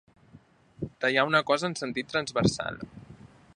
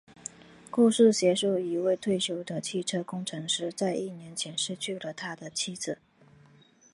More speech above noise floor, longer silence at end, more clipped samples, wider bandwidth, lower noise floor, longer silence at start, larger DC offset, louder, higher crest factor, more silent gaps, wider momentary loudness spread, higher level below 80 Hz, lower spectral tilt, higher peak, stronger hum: about the same, 29 dB vs 31 dB; second, 0.3 s vs 1 s; neither; about the same, 11 kHz vs 11.5 kHz; about the same, -57 dBFS vs -59 dBFS; second, 0.35 s vs 0.7 s; neither; about the same, -27 LUFS vs -29 LUFS; about the same, 22 dB vs 20 dB; neither; about the same, 17 LU vs 15 LU; first, -56 dBFS vs -74 dBFS; about the same, -4.5 dB/octave vs -4 dB/octave; about the same, -8 dBFS vs -10 dBFS; neither